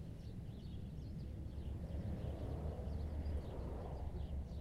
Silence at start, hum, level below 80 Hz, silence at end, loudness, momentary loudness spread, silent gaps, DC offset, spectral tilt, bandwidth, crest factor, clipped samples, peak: 0 s; none; -48 dBFS; 0 s; -47 LUFS; 6 LU; none; under 0.1%; -8.5 dB/octave; 11 kHz; 12 dB; under 0.1%; -32 dBFS